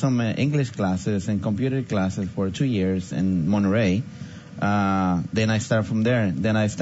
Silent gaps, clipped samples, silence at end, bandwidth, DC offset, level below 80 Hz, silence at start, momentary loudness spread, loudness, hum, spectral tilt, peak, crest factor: none; under 0.1%; 0 s; 8 kHz; under 0.1%; -56 dBFS; 0 s; 5 LU; -23 LUFS; none; -7 dB/octave; -8 dBFS; 14 dB